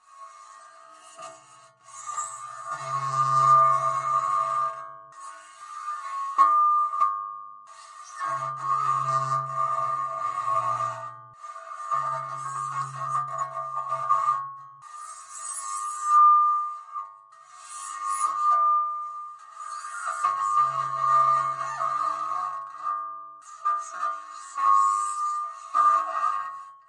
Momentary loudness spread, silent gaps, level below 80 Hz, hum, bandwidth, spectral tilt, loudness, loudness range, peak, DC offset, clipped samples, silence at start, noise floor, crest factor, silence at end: 21 LU; none; -88 dBFS; none; 11 kHz; -3 dB/octave; -25 LUFS; 6 LU; -8 dBFS; under 0.1%; under 0.1%; 0.15 s; -49 dBFS; 18 dB; 0.15 s